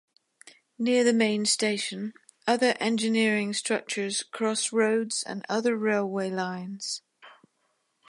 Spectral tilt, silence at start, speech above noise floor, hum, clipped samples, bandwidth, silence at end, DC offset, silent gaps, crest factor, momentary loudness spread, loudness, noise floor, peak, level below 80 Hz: -3 dB/octave; 0.8 s; 47 dB; none; under 0.1%; 11.5 kHz; 0.75 s; under 0.1%; none; 20 dB; 10 LU; -27 LUFS; -74 dBFS; -8 dBFS; -80 dBFS